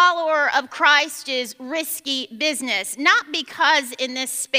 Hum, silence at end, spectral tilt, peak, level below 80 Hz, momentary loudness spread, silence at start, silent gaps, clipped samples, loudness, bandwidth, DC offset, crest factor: none; 0 s; 0.5 dB/octave; -2 dBFS; -78 dBFS; 10 LU; 0 s; none; under 0.1%; -20 LUFS; 16 kHz; under 0.1%; 18 dB